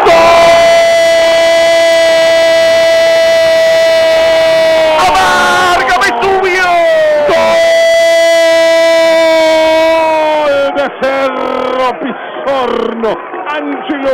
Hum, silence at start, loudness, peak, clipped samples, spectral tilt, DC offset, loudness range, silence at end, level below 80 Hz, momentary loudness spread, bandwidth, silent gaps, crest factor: none; 0 s; -8 LUFS; -2 dBFS; under 0.1%; -2.5 dB/octave; under 0.1%; 5 LU; 0 s; -40 dBFS; 8 LU; 16 kHz; none; 6 dB